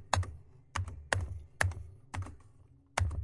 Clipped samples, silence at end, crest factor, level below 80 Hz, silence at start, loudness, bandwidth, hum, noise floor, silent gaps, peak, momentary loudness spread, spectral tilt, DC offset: under 0.1%; 0 s; 28 dB; -48 dBFS; 0 s; -37 LUFS; 11.5 kHz; none; -60 dBFS; none; -8 dBFS; 12 LU; -4 dB/octave; under 0.1%